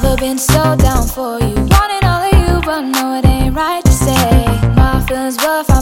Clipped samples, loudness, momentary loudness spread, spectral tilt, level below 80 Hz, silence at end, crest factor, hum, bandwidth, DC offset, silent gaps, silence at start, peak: under 0.1%; -13 LUFS; 5 LU; -5.5 dB/octave; -16 dBFS; 0 s; 12 dB; none; 17 kHz; under 0.1%; none; 0 s; 0 dBFS